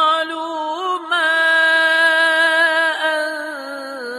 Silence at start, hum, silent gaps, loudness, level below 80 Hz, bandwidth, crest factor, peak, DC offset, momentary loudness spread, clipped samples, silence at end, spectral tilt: 0 s; none; none; -15 LUFS; -80 dBFS; 13.5 kHz; 12 dB; -4 dBFS; under 0.1%; 14 LU; under 0.1%; 0 s; 0.5 dB/octave